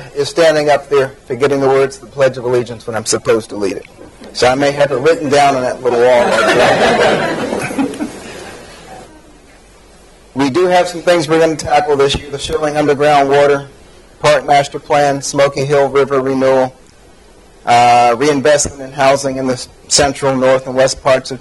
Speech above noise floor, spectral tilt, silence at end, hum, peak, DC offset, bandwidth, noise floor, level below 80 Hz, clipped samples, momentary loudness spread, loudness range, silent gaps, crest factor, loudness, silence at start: 30 dB; -4 dB/octave; 0 s; none; 0 dBFS; under 0.1%; 12 kHz; -42 dBFS; -42 dBFS; under 0.1%; 10 LU; 4 LU; none; 14 dB; -12 LUFS; 0 s